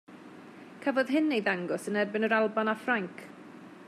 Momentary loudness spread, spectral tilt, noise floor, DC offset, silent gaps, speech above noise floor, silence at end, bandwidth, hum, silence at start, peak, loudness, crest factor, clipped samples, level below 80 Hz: 22 LU; -5.5 dB/octave; -49 dBFS; under 0.1%; none; 20 dB; 0 s; 13.5 kHz; none; 0.1 s; -14 dBFS; -29 LUFS; 16 dB; under 0.1%; -86 dBFS